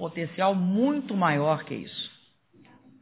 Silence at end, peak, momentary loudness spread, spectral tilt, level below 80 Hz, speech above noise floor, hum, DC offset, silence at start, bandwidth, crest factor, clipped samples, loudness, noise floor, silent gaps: 0.9 s; -10 dBFS; 11 LU; -10.5 dB/octave; -72 dBFS; 33 dB; none; under 0.1%; 0 s; 4 kHz; 18 dB; under 0.1%; -26 LUFS; -59 dBFS; none